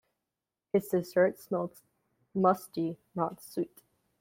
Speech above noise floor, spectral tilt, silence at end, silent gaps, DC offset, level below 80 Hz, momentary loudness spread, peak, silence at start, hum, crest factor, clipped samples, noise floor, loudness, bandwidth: 58 dB; -7 dB/octave; 0.55 s; none; under 0.1%; -76 dBFS; 10 LU; -10 dBFS; 0.75 s; none; 22 dB; under 0.1%; -89 dBFS; -32 LUFS; 16.5 kHz